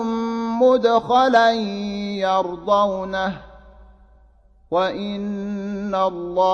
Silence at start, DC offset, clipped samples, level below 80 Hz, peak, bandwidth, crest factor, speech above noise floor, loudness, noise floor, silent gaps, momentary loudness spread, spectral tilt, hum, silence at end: 0 s; under 0.1%; under 0.1%; -52 dBFS; -4 dBFS; 7.4 kHz; 16 dB; 33 dB; -20 LUFS; -53 dBFS; none; 11 LU; -6 dB/octave; none; 0 s